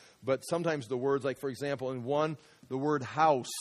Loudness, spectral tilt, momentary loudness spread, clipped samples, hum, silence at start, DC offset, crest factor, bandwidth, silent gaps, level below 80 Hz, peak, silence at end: -32 LUFS; -5.5 dB/octave; 8 LU; under 0.1%; none; 0.2 s; under 0.1%; 18 dB; 14 kHz; none; -74 dBFS; -14 dBFS; 0 s